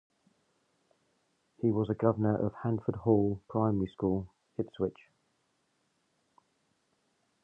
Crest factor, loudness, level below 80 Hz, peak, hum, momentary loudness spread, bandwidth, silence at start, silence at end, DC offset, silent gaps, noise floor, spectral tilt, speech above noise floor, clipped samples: 24 dB; -32 LUFS; -60 dBFS; -10 dBFS; none; 8 LU; 3.8 kHz; 1.6 s; 2.5 s; under 0.1%; none; -76 dBFS; -11 dB/octave; 46 dB; under 0.1%